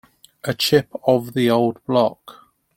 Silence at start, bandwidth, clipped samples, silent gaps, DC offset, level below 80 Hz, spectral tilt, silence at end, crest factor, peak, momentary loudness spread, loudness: 0.45 s; 17 kHz; under 0.1%; none; under 0.1%; -58 dBFS; -5.5 dB/octave; 0.45 s; 18 dB; -2 dBFS; 6 LU; -19 LUFS